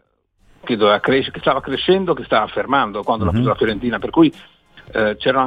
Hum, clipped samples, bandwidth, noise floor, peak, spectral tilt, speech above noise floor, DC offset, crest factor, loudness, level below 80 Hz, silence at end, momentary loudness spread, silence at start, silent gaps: none; under 0.1%; 5 kHz; -58 dBFS; -2 dBFS; -8 dB/octave; 41 dB; 0.1%; 16 dB; -18 LUFS; -42 dBFS; 0 s; 5 LU; 0.65 s; none